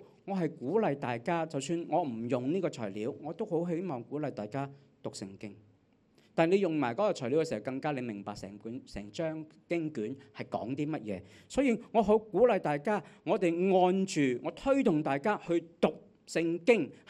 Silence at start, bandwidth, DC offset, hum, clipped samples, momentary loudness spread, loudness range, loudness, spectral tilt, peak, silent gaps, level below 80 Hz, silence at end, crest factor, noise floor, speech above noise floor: 0 s; 11 kHz; under 0.1%; none; under 0.1%; 15 LU; 9 LU; -32 LUFS; -6.5 dB/octave; -10 dBFS; none; -64 dBFS; 0.15 s; 20 dB; -67 dBFS; 35 dB